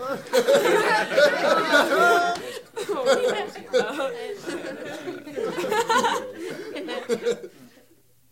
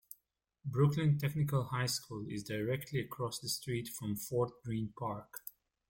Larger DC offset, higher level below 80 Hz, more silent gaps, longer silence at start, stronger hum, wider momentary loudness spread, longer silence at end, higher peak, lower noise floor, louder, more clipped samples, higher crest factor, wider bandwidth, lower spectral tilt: neither; second, -72 dBFS vs -66 dBFS; neither; second, 0 s vs 0.65 s; neither; about the same, 15 LU vs 14 LU; first, 0.65 s vs 0.4 s; first, -4 dBFS vs -18 dBFS; second, -60 dBFS vs -80 dBFS; first, -23 LUFS vs -36 LUFS; neither; about the same, 18 dB vs 18 dB; about the same, 16.5 kHz vs 17 kHz; second, -3 dB/octave vs -5.5 dB/octave